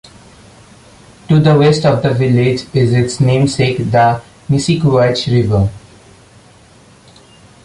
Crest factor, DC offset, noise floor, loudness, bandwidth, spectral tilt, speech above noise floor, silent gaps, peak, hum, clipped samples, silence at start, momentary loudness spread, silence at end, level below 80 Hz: 12 dB; under 0.1%; -43 dBFS; -13 LUFS; 11.5 kHz; -6.5 dB/octave; 32 dB; none; -2 dBFS; none; under 0.1%; 1.3 s; 6 LU; 1.85 s; -38 dBFS